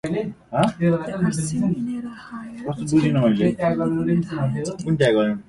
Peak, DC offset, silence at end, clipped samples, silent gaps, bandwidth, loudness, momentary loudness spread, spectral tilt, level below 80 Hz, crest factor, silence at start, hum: -4 dBFS; under 0.1%; 0.05 s; under 0.1%; none; 11.5 kHz; -22 LUFS; 12 LU; -7 dB/octave; -52 dBFS; 18 dB; 0.05 s; none